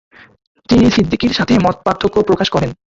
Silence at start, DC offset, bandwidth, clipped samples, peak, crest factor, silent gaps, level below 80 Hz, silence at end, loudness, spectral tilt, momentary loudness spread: 0.7 s; under 0.1%; 7.6 kHz; under 0.1%; 0 dBFS; 14 dB; none; -36 dBFS; 0.15 s; -14 LUFS; -6 dB/octave; 5 LU